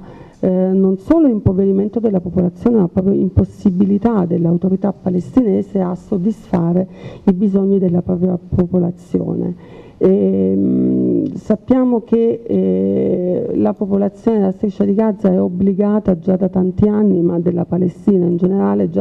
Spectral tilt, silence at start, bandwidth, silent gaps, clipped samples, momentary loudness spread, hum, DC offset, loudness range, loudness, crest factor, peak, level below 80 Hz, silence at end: -11 dB/octave; 0 s; 3.8 kHz; none; under 0.1%; 5 LU; none; under 0.1%; 2 LU; -16 LUFS; 14 dB; -2 dBFS; -38 dBFS; 0 s